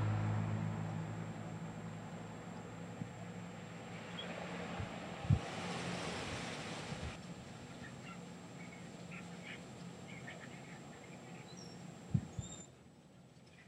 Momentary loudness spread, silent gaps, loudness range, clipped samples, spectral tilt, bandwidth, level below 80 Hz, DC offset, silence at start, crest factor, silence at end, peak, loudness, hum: 14 LU; none; 9 LU; under 0.1%; -5.5 dB/octave; 11.5 kHz; -60 dBFS; under 0.1%; 0 s; 26 dB; 0 s; -18 dBFS; -45 LUFS; none